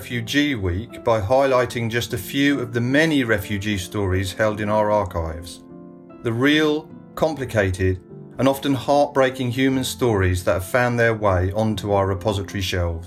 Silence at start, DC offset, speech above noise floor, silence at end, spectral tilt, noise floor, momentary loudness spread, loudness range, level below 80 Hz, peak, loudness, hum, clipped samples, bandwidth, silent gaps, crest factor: 0 s; under 0.1%; 20 dB; 0 s; -5.5 dB/octave; -41 dBFS; 9 LU; 3 LU; -44 dBFS; -4 dBFS; -21 LUFS; none; under 0.1%; 16 kHz; none; 16 dB